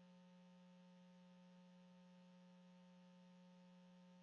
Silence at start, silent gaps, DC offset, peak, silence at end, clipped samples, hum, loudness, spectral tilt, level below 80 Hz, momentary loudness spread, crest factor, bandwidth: 0 s; none; under 0.1%; -58 dBFS; 0 s; under 0.1%; none; -67 LUFS; -6 dB/octave; under -90 dBFS; 0 LU; 8 dB; 6.8 kHz